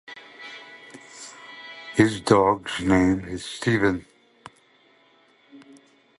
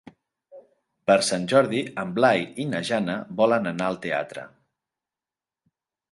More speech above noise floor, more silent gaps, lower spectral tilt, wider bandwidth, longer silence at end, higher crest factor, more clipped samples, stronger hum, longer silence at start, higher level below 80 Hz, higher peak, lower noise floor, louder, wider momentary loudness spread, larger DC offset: second, 38 dB vs over 67 dB; neither; about the same, -5.5 dB/octave vs -4.5 dB/octave; about the same, 11.5 kHz vs 11.5 kHz; second, 0.6 s vs 1.65 s; about the same, 24 dB vs 20 dB; neither; neither; second, 0.1 s vs 0.55 s; first, -50 dBFS vs -66 dBFS; about the same, -2 dBFS vs -4 dBFS; second, -59 dBFS vs under -90 dBFS; about the same, -22 LUFS vs -23 LUFS; first, 22 LU vs 8 LU; neither